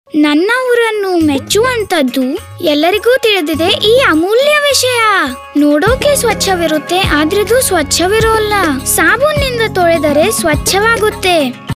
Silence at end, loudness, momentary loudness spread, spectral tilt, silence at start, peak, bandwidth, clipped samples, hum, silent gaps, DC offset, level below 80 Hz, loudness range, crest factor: 0.05 s; -10 LUFS; 4 LU; -3.5 dB/octave; 0.15 s; 0 dBFS; 16 kHz; under 0.1%; none; none; under 0.1%; -32 dBFS; 2 LU; 10 dB